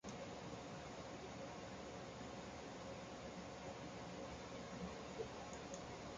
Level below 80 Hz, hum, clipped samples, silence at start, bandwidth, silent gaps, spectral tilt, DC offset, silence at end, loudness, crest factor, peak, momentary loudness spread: -66 dBFS; none; under 0.1%; 0.05 s; 9.4 kHz; none; -4.5 dB/octave; under 0.1%; 0 s; -52 LUFS; 16 dB; -36 dBFS; 2 LU